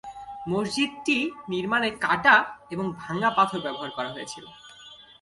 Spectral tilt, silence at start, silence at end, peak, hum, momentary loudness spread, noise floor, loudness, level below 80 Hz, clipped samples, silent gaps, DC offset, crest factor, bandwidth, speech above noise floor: -4 dB/octave; 0.05 s; 0.2 s; -4 dBFS; none; 21 LU; -49 dBFS; -25 LUFS; -62 dBFS; under 0.1%; none; under 0.1%; 22 dB; 11.5 kHz; 23 dB